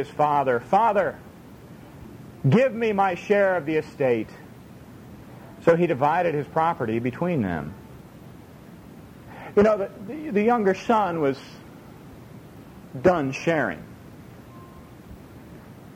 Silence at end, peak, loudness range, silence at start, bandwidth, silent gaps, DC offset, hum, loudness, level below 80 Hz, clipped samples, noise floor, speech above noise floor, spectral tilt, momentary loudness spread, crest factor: 0 s; -4 dBFS; 4 LU; 0 s; 16.5 kHz; none; under 0.1%; none; -23 LUFS; -56 dBFS; under 0.1%; -45 dBFS; 23 dB; -7.5 dB/octave; 24 LU; 20 dB